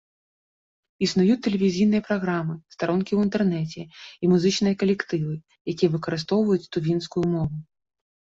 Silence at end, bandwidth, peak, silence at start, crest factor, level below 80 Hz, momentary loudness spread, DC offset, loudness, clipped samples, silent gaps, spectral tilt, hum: 0.75 s; 7.8 kHz; -8 dBFS; 1 s; 16 dB; -58 dBFS; 11 LU; under 0.1%; -24 LUFS; under 0.1%; 5.61-5.65 s; -6.5 dB/octave; none